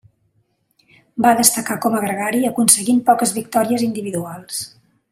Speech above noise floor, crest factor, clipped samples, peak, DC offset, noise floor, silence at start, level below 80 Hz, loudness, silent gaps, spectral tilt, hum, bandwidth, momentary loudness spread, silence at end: 47 dB; 18 dB; under 0.1%; 0 dBFS; under 0.1%; -65 dBFS; 1.15 s; -60 dBFS; -17 LUFS; none; -3 dB/octave; none; 16 kHz; 14 LU; 0.45 s